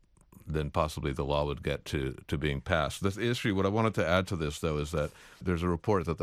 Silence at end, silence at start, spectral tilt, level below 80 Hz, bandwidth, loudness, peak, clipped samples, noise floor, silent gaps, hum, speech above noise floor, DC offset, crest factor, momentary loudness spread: 0 s; 0.35 s; -6 dB/octave; -44 dBFS; 15.5 kHz; -31 LUFS; -12 dBFS; under 0.1%; -51 dBFS; none; none; 21 dB; under 0.1%; 20 dB; 7 LU